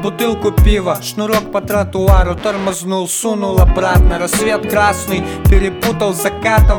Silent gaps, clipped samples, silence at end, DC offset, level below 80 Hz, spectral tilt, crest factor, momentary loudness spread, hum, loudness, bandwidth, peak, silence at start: none; under 0.1%; 0 s; under 0.1%; -16 dBFS; -5 dB/octave; 12 dB; 6 LU; none; -14 LUFS; 20 kHz; 0 dBFS; 0 s